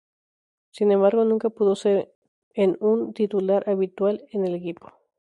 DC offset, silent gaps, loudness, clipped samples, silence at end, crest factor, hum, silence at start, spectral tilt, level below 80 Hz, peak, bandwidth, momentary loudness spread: under 0.1%; 2.15-2.22 s, 2.28-2.51 s; -23 LUFS; under 0.1%; 0.5 s; 16 dB; none; 0.75 s; -7.5 dB/octave; -72 dBFS; -6 dBFS; 10.5 kHz; 12 LU